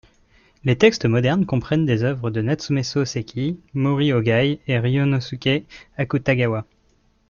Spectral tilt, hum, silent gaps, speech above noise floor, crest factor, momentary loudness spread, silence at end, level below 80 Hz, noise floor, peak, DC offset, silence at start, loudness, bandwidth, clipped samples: -6.5 dB/octave; none; none; 41 dB; 18 dB; 9 LU; 0.65 s; -50 dBFS; -61 dBFS; -2 dBFS; under 0.1%; 0.65 s; -21 LUFS; 7.2 kHz; under 0.1%